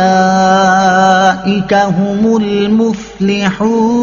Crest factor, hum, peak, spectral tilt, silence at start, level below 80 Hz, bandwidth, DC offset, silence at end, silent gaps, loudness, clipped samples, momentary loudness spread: 10 dB; none; 0 dBFS; -4.5 dB/octave; 0 s; -42 dBFS; 7.4 kHz; under 0.1%; 0 s; none; -11 LUFS; under 0.1%; 5 LU